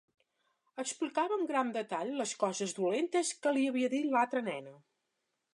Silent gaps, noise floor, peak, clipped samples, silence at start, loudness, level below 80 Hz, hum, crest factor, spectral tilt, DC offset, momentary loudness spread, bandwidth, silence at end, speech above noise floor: none; -84 dBFS; -16 dBFS; under 0.1%; 0.75 s; -33 LUFS; -90 dBFS; none; 18 dB; -3.5 dB/octave; under 0.1%; 9 LU; 11.5 kHz; 0.8 s; 51 dB